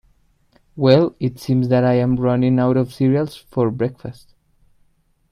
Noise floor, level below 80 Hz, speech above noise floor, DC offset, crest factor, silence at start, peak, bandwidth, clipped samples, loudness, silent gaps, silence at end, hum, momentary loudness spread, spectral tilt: -60 dBFS; -50 dBFS; 42 dB; under 0.1%; 18 dB; 0.75 s; 0 dBFS; 13 kHz; under 0.1%; -18 LUFS; none; 1.2 s; none; 10 LU; -8.5 dB/octave